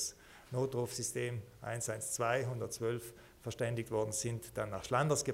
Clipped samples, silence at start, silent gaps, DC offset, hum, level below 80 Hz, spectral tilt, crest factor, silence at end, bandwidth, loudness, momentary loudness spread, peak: under 0.1%; 0 s; none; under 0.1%; none; -66 dBFS; -4.5 dB/octave; 20 dB; 0 s; 16 kHz; -37 LUFS; 9 LU; -18 dBFS